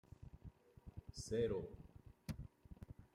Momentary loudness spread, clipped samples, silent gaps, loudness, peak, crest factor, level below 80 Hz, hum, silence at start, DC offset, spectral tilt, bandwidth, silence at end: 21 LU; under 0.1%; none; -46 LUFS; -30 dBFS; 20 dB; -62 dBFS; none; 0.2 s; under 0.1%; -6 dB/octave; 15.5 kHz; 0.1 s